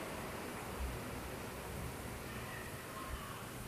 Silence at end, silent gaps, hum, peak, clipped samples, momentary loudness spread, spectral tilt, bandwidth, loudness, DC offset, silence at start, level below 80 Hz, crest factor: 0 s; none; none; -30 dBFS; under 0.1%; 2 LU; -4.5 dB/octave; 15 kHz; -45 LUFS; under 0.1%; 0 s; -52 dBFS; 14 dB